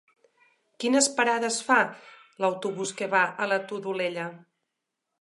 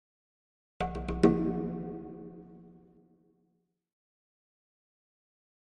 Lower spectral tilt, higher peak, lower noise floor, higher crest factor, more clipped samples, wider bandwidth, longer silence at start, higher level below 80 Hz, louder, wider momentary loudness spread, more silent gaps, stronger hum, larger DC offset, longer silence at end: second, -2.5 dB/octave vs -8 dB/octave; about the same, -6 dBFS vs -8 dBFS; first, -83 dBFS vs -77 dBFS; second, 22 dB vs 28 dB; neither; first, 11.5 kHz vs 9 kHz; about the same, 0.8 s vs 0.8 s; second, -84 dBFS vs -50 dBFS; first, -26 LUFS vs -31 LUFS; second, 10 LU vs 23 LU; neither; neither; neither; second, 0.85 s vs 3.05 s